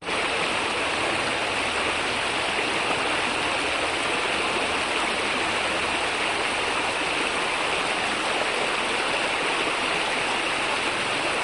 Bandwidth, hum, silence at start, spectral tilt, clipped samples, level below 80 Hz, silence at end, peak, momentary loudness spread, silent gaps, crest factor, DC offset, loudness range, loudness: 12 kHz; none; 0 s; -2 dB/octave; under 0.1%; -52 dBFS; 0 s; -10 dBFS; 1 LU; none; 14 dB; under 0.1%; 0 LU; -23 LUFS